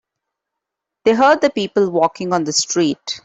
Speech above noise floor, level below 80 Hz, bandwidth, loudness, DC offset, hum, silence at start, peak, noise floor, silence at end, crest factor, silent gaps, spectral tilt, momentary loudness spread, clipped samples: 65 dB; -60 dBFS; 8.4 kHz; -16 LUFS; under 0.1%; none; 1.05 s; -2 dBFS; -81 dBFS; 0.05 s; 14 dB; none; -3.5 dB/octave; 7 LU; under 0.1%